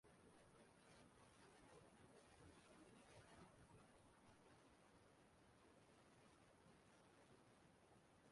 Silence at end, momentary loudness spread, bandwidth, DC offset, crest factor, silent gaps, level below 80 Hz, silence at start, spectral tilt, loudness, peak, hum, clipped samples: 0 s; 2 LU; 11.5 kHz; under 0.1%; 16 dB; none; -84 dBFS; 0.05 s; -4.5 dB/octave; -69 LUFS; -54 dBFS; none; under 0.1%